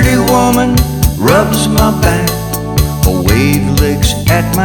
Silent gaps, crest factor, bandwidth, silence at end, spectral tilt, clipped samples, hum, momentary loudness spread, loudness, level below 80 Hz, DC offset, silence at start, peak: none; 10 dB; 19.5 kHz; 0 s; -5 dB/octave; under 0.1%; none; 5 LU; -11 LUFS; -18 dBFS; under 0.1%; 0 s; 0 dBFS